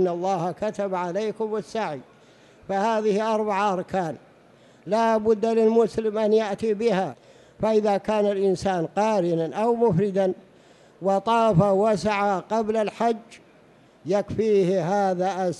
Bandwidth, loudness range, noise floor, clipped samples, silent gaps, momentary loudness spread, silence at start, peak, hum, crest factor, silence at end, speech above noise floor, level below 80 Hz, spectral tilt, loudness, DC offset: 11.5 kHz; 4 LU; -54 dBFS; under 0.1%; none; 9 LU; 0 s; -8 dBFS; none; 16 dB; 0 s; 32 dB; -56 dBFS; -6.5 dB/octave; -23 LUFS; under 0.1%